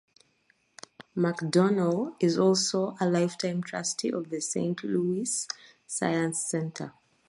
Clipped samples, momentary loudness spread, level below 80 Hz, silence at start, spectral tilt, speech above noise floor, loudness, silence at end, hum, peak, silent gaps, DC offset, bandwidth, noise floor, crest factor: under 0.1%; 13 LU; -74 dBFS; 1.15 s; -4.5 dB/octave; 41 dB; -28 LUFS; 0.4 s; none; -12 dBFS; none; under 0.1%; 11.5 kHz; -69 dBFS; 18 dB